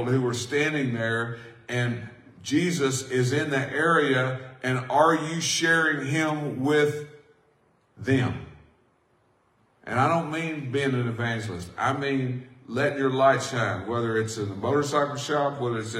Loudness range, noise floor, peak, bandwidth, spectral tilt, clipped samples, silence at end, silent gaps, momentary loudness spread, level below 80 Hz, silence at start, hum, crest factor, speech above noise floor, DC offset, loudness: 6 LU; -65 dBFS; -6 dBFS; 15.5 kHz; -5 dB/octave; under 0.1%; 0 s; none; 11 LU; -66 dBFS; 0 s; none; 20 dB; 40 dB; under 0.1%; -25 LUFS